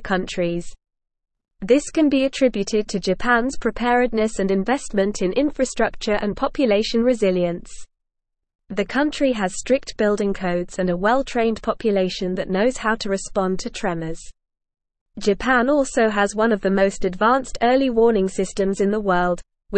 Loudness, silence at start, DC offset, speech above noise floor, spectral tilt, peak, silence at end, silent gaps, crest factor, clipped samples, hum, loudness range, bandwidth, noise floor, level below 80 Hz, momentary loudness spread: -21 LUFS; 0 s; 0.4%; 59 dB; -5 dB/octave; -4 dBFS; 0 s; 8.55-8.59 s, 15.01-15.06 s; 16 dB; under 0.1%; none; 4 LU; 8.8 kHz; -79 dBFS; -40 dBFS; 6 LU